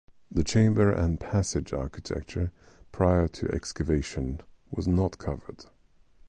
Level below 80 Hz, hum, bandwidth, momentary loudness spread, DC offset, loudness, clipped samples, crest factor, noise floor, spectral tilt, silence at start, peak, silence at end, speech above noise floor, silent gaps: -38 dBFS; none; 9.8 kHz; 12 LU; under 0.1%; -28 LUFS; under 0.1%; 18 dB; -57 dBFS; -6.5 dB/octave; 0.3 s; -10 dBFS; 0.65 s; 30 dB; none